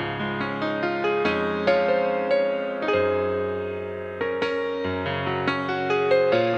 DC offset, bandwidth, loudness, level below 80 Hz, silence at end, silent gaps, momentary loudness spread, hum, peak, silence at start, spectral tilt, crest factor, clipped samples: under 0.1%; 7.2 kHz; -24 LUFS; -58 dBFS; 0 s; none; 7 LU; none; -8 dBFS; 0 s; -6.5 dB/octave; 16 dB; under 0.1%